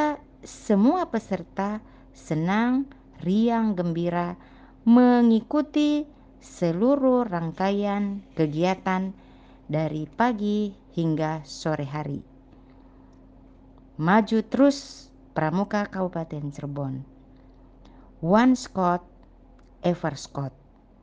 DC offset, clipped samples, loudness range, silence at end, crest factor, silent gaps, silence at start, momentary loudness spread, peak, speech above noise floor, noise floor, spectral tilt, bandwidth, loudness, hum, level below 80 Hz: under 0.1%; under 0.1%; 6 LU; 0.55 s; 18 dB; none; 0 s; 14 LU; -6 dBFS; 28 dB; -52 dBFS; -7 dB/octave; 9 kHz; -25 LUFS; none; -54 dBFS